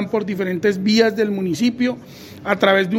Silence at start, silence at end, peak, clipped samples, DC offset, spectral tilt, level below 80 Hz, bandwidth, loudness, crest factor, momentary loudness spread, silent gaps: 0 s; 0 s; -2 dBFS; under 0.1%; under 0.1%; -5.5 dB/octave; -58 dBFS; 16.5 kHz; -19 LUFS; 18 dB; 11 LU; none